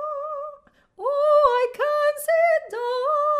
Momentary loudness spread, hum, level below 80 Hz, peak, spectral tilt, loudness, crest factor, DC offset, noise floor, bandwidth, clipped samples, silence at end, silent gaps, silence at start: 13 LU; none; -62 dBFS; -6 dBFS; -1 dB/octave; -21 LUFS; 16 dB; under 0.1%; -49 dBFS; 15.5 kHz; under 0.1%; 0 s; none; 0 s